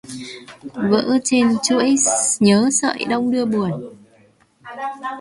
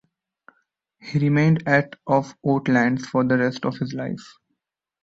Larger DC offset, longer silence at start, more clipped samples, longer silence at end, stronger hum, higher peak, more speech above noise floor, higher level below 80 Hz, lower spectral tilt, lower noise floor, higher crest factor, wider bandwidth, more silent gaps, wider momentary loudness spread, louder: neither; second, 0.05 s vs 1.05 s; neither; second, 0 s vs 0.8 s; neither; about the same, -2 dBFS vs -4 dBFS; second, 36 dB vs 58 dB; about the same, -60 dBFS vs -60 dBFS; second, -3.5 dB/octave vs -7.5 dB/octave; second, -54 dBFS vs -79 dBFS; about the same, 16 dB vs 20 dB; first, 11.5 kHz vs 7.8 kHz; neither; first, 19 LU vs 11 LU; first, -17 LUFS vs -22 LUFS